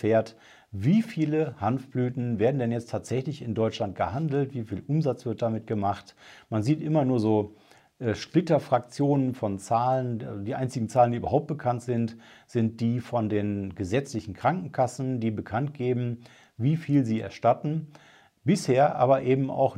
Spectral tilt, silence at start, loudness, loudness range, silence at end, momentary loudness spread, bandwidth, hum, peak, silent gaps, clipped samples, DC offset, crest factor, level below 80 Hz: -7.5 dB/octave; 0 s; -27 LUFS; 3 LU; 0 s; 9 LU; 12.5 kHz; none; -8 dBFS; none; under 0.1%; under 0.1%; 18 dB; -66 dBFS